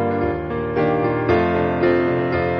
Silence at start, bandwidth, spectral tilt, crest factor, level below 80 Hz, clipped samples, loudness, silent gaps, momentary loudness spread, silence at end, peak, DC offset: 0 s; 5.8 kHz; -9.5 dB/octave; 14 dB; -40 dBFS; under 0.1%; -19 LUFS; none; 5 LU; 0 s; -6 dBFS; under 0.1%